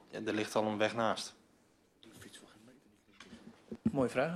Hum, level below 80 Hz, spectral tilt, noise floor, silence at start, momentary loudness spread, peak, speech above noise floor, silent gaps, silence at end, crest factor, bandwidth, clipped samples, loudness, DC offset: none; -72 dBFS; -5 dB/octave; -69 dBFS; 0.1 s; 23 LU; -16 dBFS; 35 dB; none; 0 s; 22 dB; 14.5 kHz; under 0.1%; -35 LUFS; under 0.1%